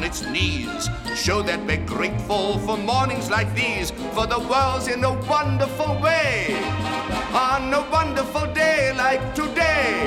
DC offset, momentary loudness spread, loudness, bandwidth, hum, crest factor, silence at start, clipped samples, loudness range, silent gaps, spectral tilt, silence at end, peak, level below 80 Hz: under 0.1%; 6 LU; -22 LUFS; 16.5 kHz; none; 16 dB; 0 s; under 0.1%; 2 LU; none; -4.5 dB/octave; 0 s; -6 dBFS; -38 dBFS